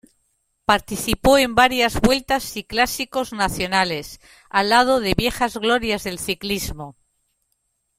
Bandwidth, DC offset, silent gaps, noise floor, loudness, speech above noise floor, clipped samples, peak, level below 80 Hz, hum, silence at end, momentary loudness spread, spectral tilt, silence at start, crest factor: 16.5 kHz; under 0.1%; none; -71 dBFS; -20 LUFS; 51 dB; under 0.1%; -2 dBFS; -40 dBFS; none; 1.05 s; 10 LU; -3.5 dB/octave; 0.7 s; 20 dB